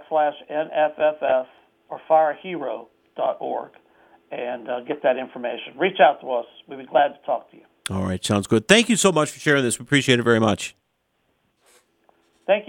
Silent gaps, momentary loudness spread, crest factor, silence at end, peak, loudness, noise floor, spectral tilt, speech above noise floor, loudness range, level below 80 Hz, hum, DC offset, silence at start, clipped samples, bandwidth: none; 17 LU; 22 dB; 0.05 s; 0 dBFS; -21 LUFS; -71 dBFS; -4 dB/octave; 49 dB; 7 LU; -62 dBFS; none; under 0.1%; 0 s; under 0.1%; 17 kHz